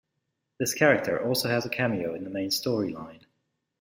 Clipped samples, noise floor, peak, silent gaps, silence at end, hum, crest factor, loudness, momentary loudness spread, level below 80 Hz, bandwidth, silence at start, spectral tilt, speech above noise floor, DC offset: under 0.1%; -80 dBFS; -6 dBFS; none; 0.65 s; none; 22 dB; -27 LUFS; 11 LU; -66 dBFS; 16.5 kHz; 0.6 s; -4 dB/octave; 53 dB; under 0.1%